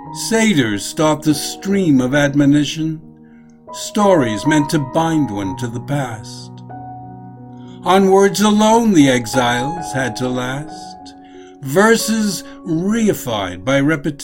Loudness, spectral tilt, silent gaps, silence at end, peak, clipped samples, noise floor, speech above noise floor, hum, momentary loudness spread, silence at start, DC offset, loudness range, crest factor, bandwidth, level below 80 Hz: -16 LUFS; -5 dB/octave; none; 0 s; 0 dBFS; under 0.1%; -43 dBFS; 27 dB; none; 21 LU; 0 s; under 0.1%; 5 LU; 16 dB; 16.5 kHz; -46 dBFS